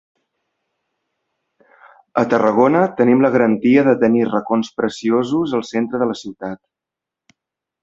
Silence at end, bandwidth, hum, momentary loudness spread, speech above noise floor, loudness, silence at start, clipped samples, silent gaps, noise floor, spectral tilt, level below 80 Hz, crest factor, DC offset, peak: 1.3 s; 7.8 kHz; none; 12 LU; 70 dB; -16 LUFS; 2.15 s; under 0.1%; none; -85 dBFS; -7 dB/octave; -60 dBFS; 18 dB; under 0.1%; -2 dBFS